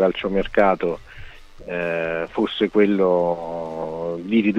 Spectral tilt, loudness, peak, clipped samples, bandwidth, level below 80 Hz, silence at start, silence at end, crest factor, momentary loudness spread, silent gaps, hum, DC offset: -7.5 dB/octave; -22 LUFS; -4 dBFS; under 0.1%; 8.2 kHz; -44 dBFS; 0 s; 0 s; 18 dB; 11 LU; none; none; under 0.1%